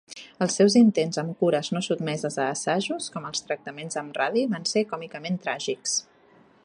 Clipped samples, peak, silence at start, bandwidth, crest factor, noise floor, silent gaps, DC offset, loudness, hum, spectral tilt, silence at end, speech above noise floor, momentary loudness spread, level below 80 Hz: under 0.1%; -8 dBFS; 0.1 s; 11 kHz; 18 dB; -57 dBFS; none; under 0.1%; -25 LUFS; none; -4 dB/octave; 0.65 s; 32 dB; 12 LU; -74 dBFS